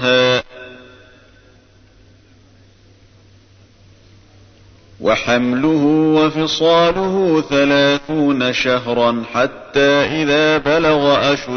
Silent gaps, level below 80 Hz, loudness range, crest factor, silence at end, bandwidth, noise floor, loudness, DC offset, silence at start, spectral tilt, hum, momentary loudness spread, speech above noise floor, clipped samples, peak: none; -46 dBFS; 8 LU; 14 dB; 0 s; 6.6 kHz; -48 dBFS; -15 LUFS; under 0.1%; 0 s; -5 dB/octave; none; 5 LU; 34 dB; under 0.1%; -2 dBFS